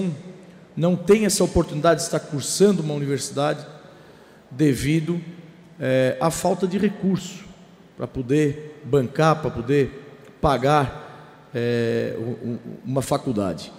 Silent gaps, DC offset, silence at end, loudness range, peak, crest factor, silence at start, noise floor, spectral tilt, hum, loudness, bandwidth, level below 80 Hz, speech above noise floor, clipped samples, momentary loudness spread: none; under 0.1%; 0 s; 4 LU; -6 dBFS; 16 dB; 0 s; -48 dBFS; -5.5 dB/octave; none; -22 LUFS; 16 kHz; -46 dBFS; 27 dB; under 0.1%; 16 LU